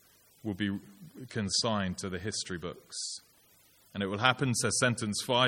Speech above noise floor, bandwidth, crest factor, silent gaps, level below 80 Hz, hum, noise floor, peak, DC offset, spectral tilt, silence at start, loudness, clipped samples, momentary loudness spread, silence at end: 31 dB; 17 kHz; 26 dB; none; -64 dBFS; none; -63 dBFS; -8 dBFS; under 0.1%; -3.5 dB/octave; 0.45 s; -32 LUFS; under 0.1%; 15 LU; 0 s